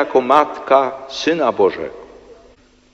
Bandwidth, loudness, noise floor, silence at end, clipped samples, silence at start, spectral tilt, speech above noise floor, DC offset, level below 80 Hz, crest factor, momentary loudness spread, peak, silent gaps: 9.4 kHz; -16 LUFS; -50 dBFS; 0.6 s; under 0.1%; 0 s; -4.5 dB/octave; 34 dB; under 0.1%; -56 dBFS; 18 dB; 11 LU; 0 dBFS; none